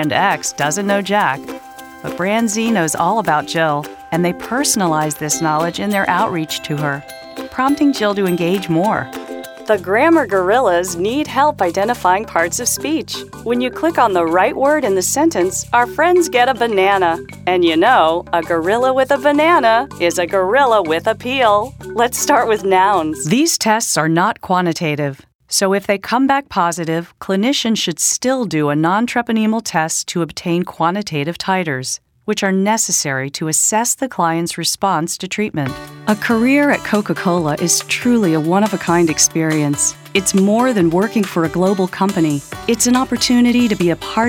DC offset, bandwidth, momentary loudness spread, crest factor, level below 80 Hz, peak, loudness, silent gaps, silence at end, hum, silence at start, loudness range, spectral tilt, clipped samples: under 0.1%; 19 kHz; 8 LU; 16 dB; -48 dBFS; 0 dBFS; -16 LUFS; 25.35-25.39 s; 0 s; none; 0 s; 3 LU; -4 dB/octave; under 0.1%